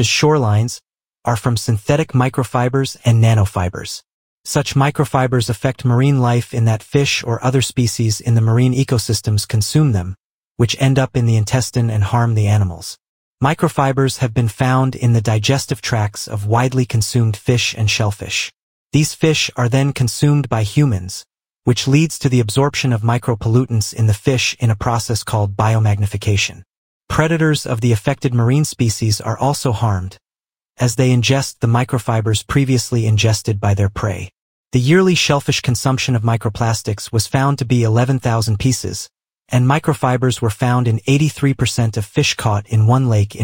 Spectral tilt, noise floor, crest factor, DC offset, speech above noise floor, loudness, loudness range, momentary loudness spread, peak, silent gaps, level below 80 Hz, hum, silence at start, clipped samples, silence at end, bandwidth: -5.5 dB/octave; under -90 dBFS; 16 dB; under 0.1%; over 75 dB; -16 LUFS; 1 LU; 6 LU; 0 dBFS; 4.13-4.44 s, 10.20-10.41 s, 10.47-10.55 s, 13.08-13.35 s, 18.62-18.90 s, 26.77-27.00 s, 34.41-34.65 s; -42 dBFS; none; 0 s; under 0.1%; 0 s; 17 kHz